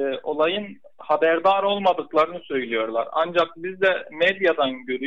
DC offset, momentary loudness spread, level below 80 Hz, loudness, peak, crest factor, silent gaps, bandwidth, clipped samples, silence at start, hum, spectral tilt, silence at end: 0.3%; 7 LU; -70 dBFS; -22 LUFS; -8 dBFS; 14 dB; none; 7.8 kHz; under 0.1%; 0 s; none; -5.5 dB/octave; 0 s